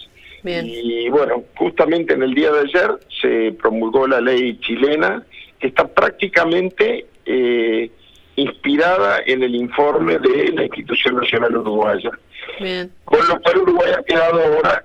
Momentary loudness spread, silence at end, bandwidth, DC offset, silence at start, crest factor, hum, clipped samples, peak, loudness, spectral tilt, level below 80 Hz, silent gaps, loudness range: 10 LU; 0.05 s; 8 kHz; under 0.1%; 0 s; 16 dB; none; under 0.1%; 0 dBFS; -17 LUFS; -6 dB/octave; -52 dBFS; none; 2 LU